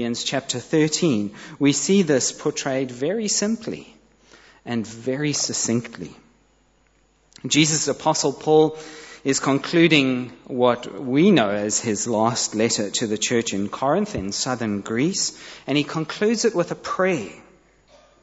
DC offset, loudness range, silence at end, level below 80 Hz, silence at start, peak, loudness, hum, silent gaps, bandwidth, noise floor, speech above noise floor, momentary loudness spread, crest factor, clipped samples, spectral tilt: under 0.1%; 6 LU; 0.8 s; -60 dBFS; 0 s; -2 dBFS; -21 LUFS; none; none; 8.2 kHz; -61 dBFS; 39 dB; 11 LU; 20 dB; under 0.1%; -4 dB/octave